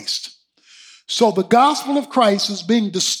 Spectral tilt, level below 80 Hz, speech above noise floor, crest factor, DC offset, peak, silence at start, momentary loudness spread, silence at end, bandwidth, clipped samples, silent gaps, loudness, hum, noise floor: -3.5 dB/octave; -72 dBFS; 33 dB; 16 dB; under 0.1%; -2 dBFS; 0 s; 10 LU; 0 s; 17.5 kHz; under 0.1%; none; -17 LUFS; none; -50 dBFS